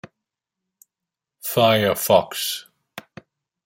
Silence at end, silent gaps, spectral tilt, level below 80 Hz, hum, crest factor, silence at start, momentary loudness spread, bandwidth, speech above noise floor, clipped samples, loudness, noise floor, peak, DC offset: 0.65 s; none; -3.5 dB/octave; -64 dBFS; none; 22 dB; 1.45 s; 23 LU; 16.5 kHz; 68 dB; under 0.1%; -19 LUFS; -86 dBFS; -2 dBFS; under 0.1%